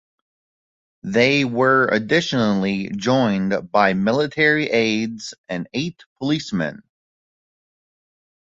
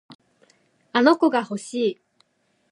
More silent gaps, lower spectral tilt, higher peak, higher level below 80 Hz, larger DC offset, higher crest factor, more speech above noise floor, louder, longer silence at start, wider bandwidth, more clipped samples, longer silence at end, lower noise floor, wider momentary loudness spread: first, 5.38-5.44 s, 6.06-6.16 s vs 0.15-0.19 s; about the same, -5.5 dB/octave vs -4.5 dB/octave; about the same, -2 dBFS vs -2 dBFS; first, -58 dBFS vs -80 dBFS; neither; about the same, 18 dB vs 22 dB; first, over 71 dB vs 48 dB; about the same, -19 LUFS vs -21 LUFS; first, 1.05 s vs 0.1 s; second, 7.8 kHz vs 11 kHz; neither; first, 1.7 s vs 0.8 s; first, under -90 dBFS vs -68 dBFS; about the same, 12 LU vs 11 LU